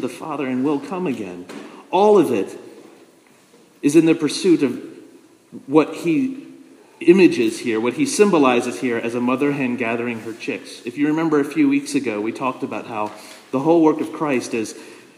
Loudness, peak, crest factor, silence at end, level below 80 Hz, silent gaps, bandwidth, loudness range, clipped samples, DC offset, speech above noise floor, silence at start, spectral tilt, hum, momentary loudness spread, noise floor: -19 LUFS; 0 dBFS; 20 dB; 0.2 s; -76 dBFS; none; 15 kHz; 4 LU; under 0.1%; under 0.1%; 33 dB; 0 s; -5.5 dB/octave; none; 16 LU; -52 dBFS